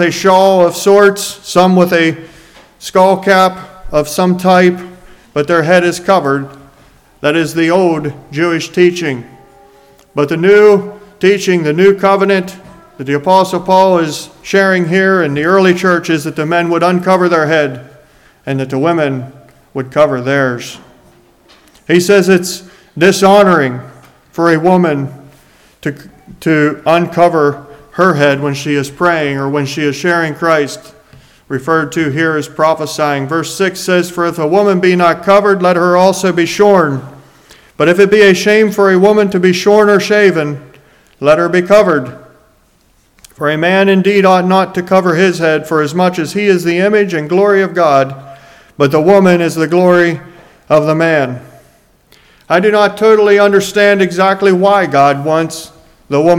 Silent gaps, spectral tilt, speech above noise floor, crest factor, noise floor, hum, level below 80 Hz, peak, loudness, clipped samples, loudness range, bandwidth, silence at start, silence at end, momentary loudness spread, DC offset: none; -5.5 dB/octave; 41 dB; 12 dB; -51 dBFS; none; -48 dBFS; 0 dBFS; -10 LUFS; 0.5%; 5 LU; 16.5 kHz; 0 s; 0 s; 12 LU; under 0.1%